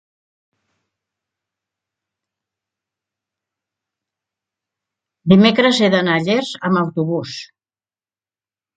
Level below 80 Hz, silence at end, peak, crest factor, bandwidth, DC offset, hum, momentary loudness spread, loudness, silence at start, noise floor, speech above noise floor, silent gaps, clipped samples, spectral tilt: -62 dBFS; 1.3 s; 0 dBFS; 20 dB; 9 kHz; under 0.1%; none; 15 LU; -15 LUFS; 5.25 s; under -90 dBFS; over 75 dB; none; under 0.1%; -6 dB/octave